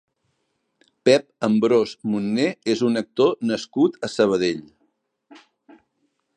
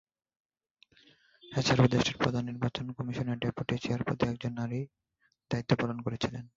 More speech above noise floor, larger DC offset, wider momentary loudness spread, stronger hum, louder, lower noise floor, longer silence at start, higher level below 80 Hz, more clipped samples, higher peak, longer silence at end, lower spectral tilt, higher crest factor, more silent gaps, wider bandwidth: first, 53 dB vs 37 dB; neither; second, 6 LU vs 11 LU; neither; first, -21 LUFS vs -32 LUFS; first, -73 dBFS vs -68 dBFS; second, 1.05 s vs 1.45 s; second, -66 dBFS vs -58 dBFS; neither; first, -2 dBFS vs -10 dBFS; first, 1.05 s vs 0.1 s; about the same, -5.5 dB/octave vs -6 dB/octave; about the same, 20 dB vs 22 dB; neither; first, 10 kHz vs 7.8 kHz